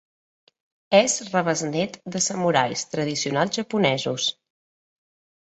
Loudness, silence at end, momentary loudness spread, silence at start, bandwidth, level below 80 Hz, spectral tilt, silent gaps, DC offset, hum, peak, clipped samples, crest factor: -23 LUFS; 1.15 s; 7 LU; 0.9 s; 8.6 kHz; -66 dBFS; -3.5 dB/octave; none; under 0.1%; none; -2 dBFS; under 0.1%; 22 dB